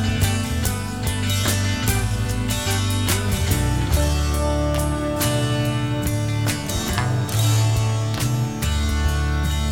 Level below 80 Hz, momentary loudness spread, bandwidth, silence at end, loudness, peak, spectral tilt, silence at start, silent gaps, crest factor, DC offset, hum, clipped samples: -28 dBFS; 3 LU; 18.5 kHz; 0 s; -21 LUFS; -4 dBFS; -4.5 dB/octave; 0 s; none; 16 dB; 0.6%; none; under 0.1%